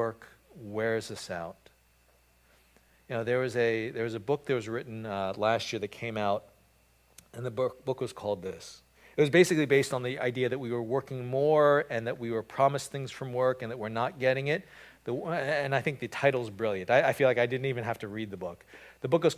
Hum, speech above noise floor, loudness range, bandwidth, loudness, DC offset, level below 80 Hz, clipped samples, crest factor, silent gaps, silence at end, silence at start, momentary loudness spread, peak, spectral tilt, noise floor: none; 35 dB; 6 LU; 16 kHz; -30 LUFS; under 0.1%; -66 dBFS; under 0.1%; 20 dB; none; 0 s; 0 s; 13 LU; -10 dBFS; -5.5 dB/octave; -65 dBFS